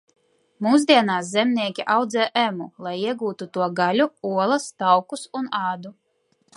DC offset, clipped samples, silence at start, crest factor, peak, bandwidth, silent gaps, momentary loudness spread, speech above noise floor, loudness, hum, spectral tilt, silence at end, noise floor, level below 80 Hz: under 0.1%; under 0.1%; 0.6 s; 20 dB; -2 dBFS; 11.5 kHz; none; 12 LU; 45 dB; -22 LUFS; none; -4.5 dB/octave; 0.65 s; -67 dBFS; -76 dBFS